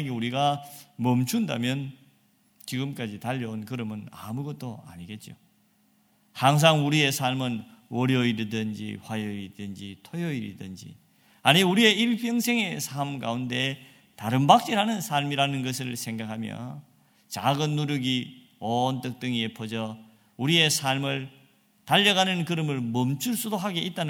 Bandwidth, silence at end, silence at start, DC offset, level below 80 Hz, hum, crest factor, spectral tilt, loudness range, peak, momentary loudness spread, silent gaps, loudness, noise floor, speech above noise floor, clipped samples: 18 kHz; 0 s; 0 s; under 0.1%; -70 dBFS; none; 26 dB; -4.5 dB/octave; 9 LU; -2 dBFS; 19 LU; none; -26 LUFS; -65 dBFS; 39 dB; under 0.1%